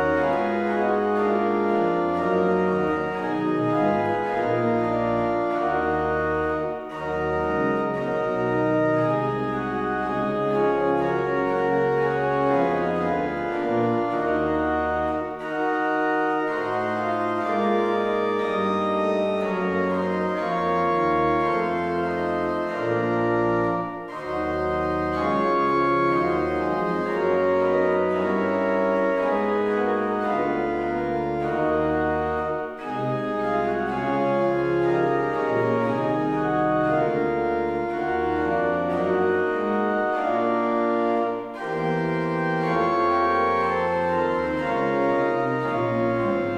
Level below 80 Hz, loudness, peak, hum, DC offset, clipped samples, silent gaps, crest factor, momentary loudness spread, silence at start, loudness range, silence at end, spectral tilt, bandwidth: -50 dBFS; -23 LUFS; -10 dBFS; none; under 0.1%; under 0.1%; none; 14 dB; 4 LU; 0 s; 2 LU; 0 s; -8 dB/octave; 9 kHz